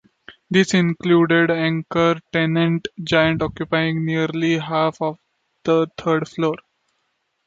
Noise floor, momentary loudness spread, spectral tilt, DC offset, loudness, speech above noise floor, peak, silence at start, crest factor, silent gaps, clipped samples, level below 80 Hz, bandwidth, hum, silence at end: -71 dBFS; 7 LU; -6 dB/octave; under 0.1%; -19 LUFS; 52 dB; -2 dBFS; 0.3 s; 18 dB; none; under 0.1%; -52 dBFS; 8 kHz; none; 0.9 s